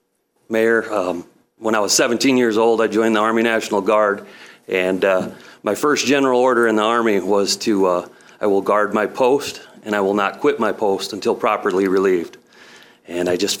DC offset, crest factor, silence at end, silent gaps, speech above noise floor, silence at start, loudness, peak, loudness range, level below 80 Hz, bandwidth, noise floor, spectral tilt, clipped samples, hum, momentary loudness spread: under 0.1%; 16 dB; 0 s; none; 41 dB; 0.5 s; -18 LUFS; -2 dBFS; 3 LU; -66 dBFS; 17 kHz; -58 dBFS; -3.5 dB/octave; under 0.1%; none; 9 LU